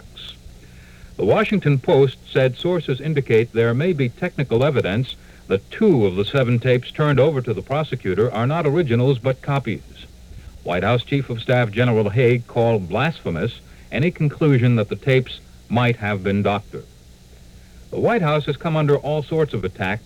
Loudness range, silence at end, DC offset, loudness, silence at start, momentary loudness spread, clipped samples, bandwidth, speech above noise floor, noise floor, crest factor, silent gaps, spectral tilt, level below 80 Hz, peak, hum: 3 LU; 0.05 s; 0.1%; -20 LUFS; 0.15 s; 9 LU; under 0.1%; 11 kHz; 27 dB; -45 dBFS; 14 dB; none; -8 dB/octave; -46 dBFS; -4 dBFS; none